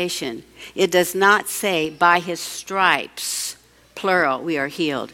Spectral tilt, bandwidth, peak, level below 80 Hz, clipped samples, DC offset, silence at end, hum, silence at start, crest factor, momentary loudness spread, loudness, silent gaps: -2.5 dB/octave; 17 kHz; -2 dBFS; -60 dBFS; under 0.1%; under 0.1%; 0 s; none; 0 s; 20 dB; 12 LU; -20 LUFS; none